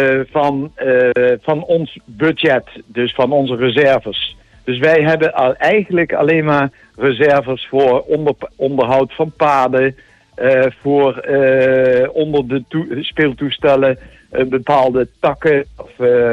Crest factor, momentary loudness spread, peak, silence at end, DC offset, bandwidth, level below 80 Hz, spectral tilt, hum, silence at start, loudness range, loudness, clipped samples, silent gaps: 12 dB; 8 LU; -2 dBFS; 0 s; under 0.1%; 7.4 kHz; -48 dBFS; -7 dB/octave; none; 0 s; 2 LU; -14 LUFS; under 0.1%; none